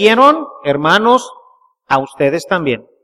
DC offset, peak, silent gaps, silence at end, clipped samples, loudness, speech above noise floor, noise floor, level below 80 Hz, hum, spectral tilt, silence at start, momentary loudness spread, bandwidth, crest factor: under 0.1%; 0 dBFS; none; 0.25 s; under 0.1%; -13 LUFS; 36 dB; -49 dBFS; -54 dBFS; none; -5 dB/octave; 0 s; 9 LU; 14.5 kHz; 14 dB